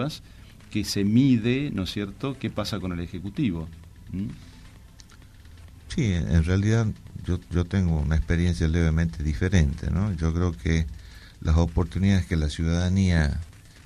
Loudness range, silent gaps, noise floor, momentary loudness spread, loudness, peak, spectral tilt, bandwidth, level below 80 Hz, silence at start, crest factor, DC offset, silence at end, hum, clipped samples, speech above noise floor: 7 LU; none; -48 dBFS; 11 LU; -25 LUFS; -8 dBFS; -6.5 dB/octave; 13.5 kHz; -34 dBFS; 0 s; 18 dB; under 0.1%; 0.3 s; none; under 0.1%; 24 dB